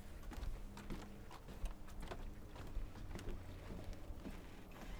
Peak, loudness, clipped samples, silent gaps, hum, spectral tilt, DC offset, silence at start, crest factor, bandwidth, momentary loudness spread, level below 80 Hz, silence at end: -32 dBFS; -53 LUFS; under 0.1%; none; none; -5.5 dB/octave; under 0.1%; 0 s; 16 dB; over 20 kHz; 4 LU; -50 dBFS; 0 s